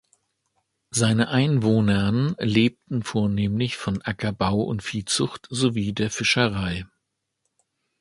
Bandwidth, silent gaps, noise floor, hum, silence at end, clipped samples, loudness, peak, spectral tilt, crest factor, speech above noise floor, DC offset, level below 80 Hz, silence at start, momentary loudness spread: 11.5 kHz; none; -78 dBFS; none; 1.15 s; under 0.1%; -23 LUFS; -4 dBFS; -5 dB/octave; 20 dB; 56 dB; under 0.1%; -48 dBFS; 0.95 s; 8 LU